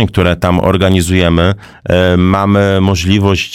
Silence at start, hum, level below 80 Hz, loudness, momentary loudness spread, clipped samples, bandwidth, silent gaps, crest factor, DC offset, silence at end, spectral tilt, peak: 0 s; none; -30 dBFS; -11 LUFS; 3 LU; under 0.1%; 15 kHz; none; 10 dB; 0.7%; 0 s; -6 dB/octave; 0 dBFS